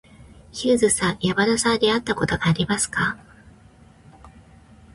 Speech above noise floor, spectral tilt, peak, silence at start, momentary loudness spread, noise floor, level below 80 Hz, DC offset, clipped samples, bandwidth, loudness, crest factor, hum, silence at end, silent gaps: 29 dB; -4 dB/octave; -6 dBFS; 0.2 s; 7 LU; -50 dBFS; -48 dBFS; under 0.1%; under 0.1%; 11.5 kHz; -21 LUFS; 18 dB; none; 0.65 s; none